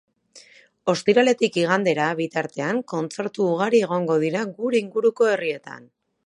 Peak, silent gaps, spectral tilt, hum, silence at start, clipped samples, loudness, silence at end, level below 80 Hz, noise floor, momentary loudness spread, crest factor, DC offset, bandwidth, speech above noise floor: -4 dBFS; none; -5 dB/octave; none; 0.35 s; under 0.1%; -22 LUFS; 0.45 s; -74 dBFS; -51 dBFS; 10 LU; 18 dB; under 0.1%; 11 kHz; 29 dB